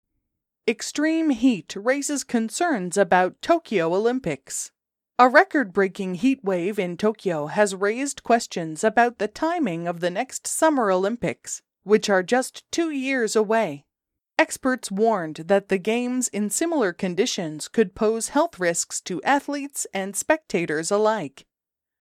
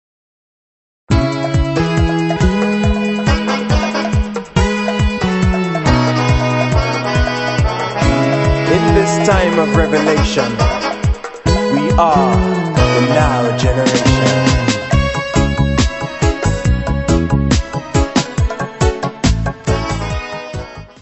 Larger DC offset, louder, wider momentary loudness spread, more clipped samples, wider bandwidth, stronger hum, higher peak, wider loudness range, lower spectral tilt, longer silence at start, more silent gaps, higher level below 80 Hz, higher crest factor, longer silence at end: neither; second, -23 LUFS vs -15 LUFS; about the same, 8 LU vs 6 LU; neither; first, 16 kHz vs 8.4 kHz; neither; about the same, -2 dBFS vs 0 dBFS; about the same, 3 LU vs 3 LU; second, -4 dB/octave vs -6 dB/octave; second, 0.65 s vs 1.1 s; neither; second, -62 dBFS vs -22 dBFS; first, 22 dB vs 14 dB; first, 0.6 s vs 0.15 s